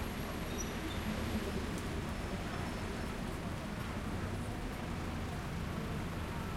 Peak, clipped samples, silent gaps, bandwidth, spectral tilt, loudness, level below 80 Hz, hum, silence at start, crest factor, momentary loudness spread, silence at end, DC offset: -26 dBFS; under 0.1%; none; 16.5 kHz; -5.5 dB/octave; -40 LUFS; -46 dBFS; none; 0 s; 14 dB; 3 LU; 0 s; under 0.1%